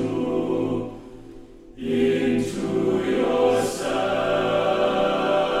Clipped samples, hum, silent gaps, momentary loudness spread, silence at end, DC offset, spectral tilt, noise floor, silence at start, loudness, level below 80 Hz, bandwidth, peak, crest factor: under 0.1%; none; none; 7 LU; 0 s; under 0.1%; -5.5 dB/octave; -43 dBFS; 0 s; -22 LUFS; -48 dBFS; 14 kHz; -8 dBFS; 16 dB